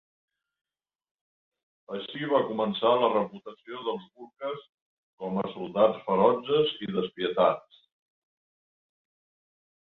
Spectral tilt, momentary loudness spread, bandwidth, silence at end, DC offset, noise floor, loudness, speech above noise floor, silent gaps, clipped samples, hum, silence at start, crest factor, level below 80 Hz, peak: -8.5 dB/octave; 15 LU; 4.3 kHz; 2.35 s; under 0.1%; under -90 dBFS; -27 LUFS; over 63 dB; 4.69-5.18 s; under 0.1%; none; 1.9 s; 22 dB; -72 dBFS; -8 dBFS